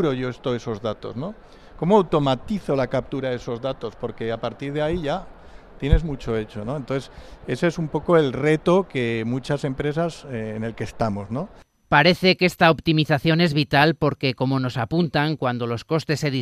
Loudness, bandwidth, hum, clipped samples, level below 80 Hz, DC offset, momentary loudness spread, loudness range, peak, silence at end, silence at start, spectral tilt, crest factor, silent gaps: -22 LUFS; 14.5 kHz; none; under 0.1%; -36 dBFS; under 0.1%; 13 LU; 8 LU; 0 dBFS; 0 s; 0 s; -6.5 dB/octave; 22 dB; none